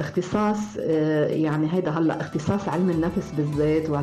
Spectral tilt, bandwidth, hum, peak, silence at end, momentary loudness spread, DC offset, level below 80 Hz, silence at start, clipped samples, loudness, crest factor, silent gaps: -7.5 dB/octave; 12.5 kHz; none; -12 dBFS; 0 s; 4 LU; under 0.1%; -50 dBFS; 0 s; under 0.1%; -24 LUFS; 10 dB; none